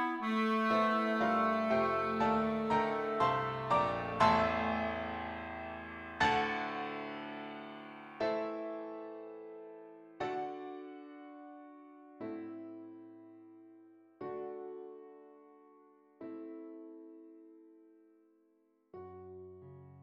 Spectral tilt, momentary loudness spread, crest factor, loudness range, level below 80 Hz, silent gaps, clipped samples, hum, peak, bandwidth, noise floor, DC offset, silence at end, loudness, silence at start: -6 dB/octave; 23 LU; 24 dB; 21 LU; -64 dBFS; none; under 0.1%; none; -14 dBFS; 11 kHz; -73 dBFS; under 0.1%; 0 s; -34 LUFS; 0 s